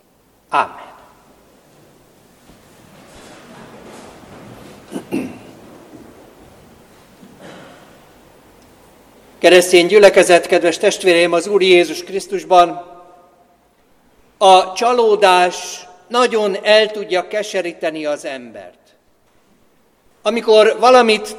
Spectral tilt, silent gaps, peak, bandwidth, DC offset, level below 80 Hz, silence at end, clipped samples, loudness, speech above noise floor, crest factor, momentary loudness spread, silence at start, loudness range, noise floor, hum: -3 dB/octave; none; 0 dBFS; 15.5 kHz; under 0.1%; -58 dBFS; 0 s; under 0.1%; -13 LUFS; 44 dB; 16 dB; 16 LU; 0.5 s; 20 LU; -57 dBFS; none